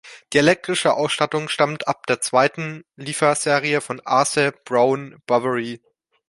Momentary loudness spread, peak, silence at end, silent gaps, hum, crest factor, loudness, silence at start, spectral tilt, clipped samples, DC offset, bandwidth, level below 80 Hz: 10 LU; -2 dBFS; 0.55 s; none; none; 20 dB; -20 LUFS; 0.05 s; -3.5 dB/octave; under 0.1%; under 0.1%; 11.5 kHz; -64 dBFS